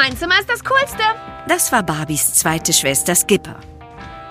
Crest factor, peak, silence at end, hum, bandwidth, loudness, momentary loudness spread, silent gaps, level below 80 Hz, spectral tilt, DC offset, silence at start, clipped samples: 18 dB; 0 dBFS; 0 s; none; 15.5 kHz; -15 LUFS; 15 LU; none; -42 dBFS; -2 dB/octave; under 0.1%; 0 s; under 0.1%